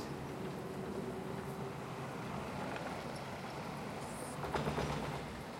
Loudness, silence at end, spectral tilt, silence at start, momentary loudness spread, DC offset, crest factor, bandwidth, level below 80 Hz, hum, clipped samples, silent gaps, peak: -42 LUFS; 0 s; -5.5 dB/octave; 0 s; 6 LU; under 0.1%; 18 dB; 16.5 kHz; -58 dBFS; none; under 0.1%; none; -24 dBFS